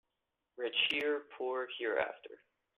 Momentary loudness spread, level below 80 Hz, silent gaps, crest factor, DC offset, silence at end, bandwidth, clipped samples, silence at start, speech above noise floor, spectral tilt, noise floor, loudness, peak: 12 LU; -80 dBFS; none; 20 dB; under 0.1%; 0.45 s; 11.5 kHz; under 0.1%; 0.55 s; 50 dB; -3 dB/octave; -87 dBFS; -35 LUFS; -18 dBFS